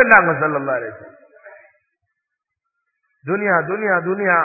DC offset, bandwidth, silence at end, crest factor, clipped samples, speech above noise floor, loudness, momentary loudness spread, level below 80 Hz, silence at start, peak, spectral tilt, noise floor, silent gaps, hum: under 0.1%; 2.7 kHz; 0 s; 20 dB; under 0.1%; 63 dB; -17 LUFS; 13 LU; -60 dBFS; 0 s; 0 dBFS; -10.5 dB/octave; -80 dBFS; none; none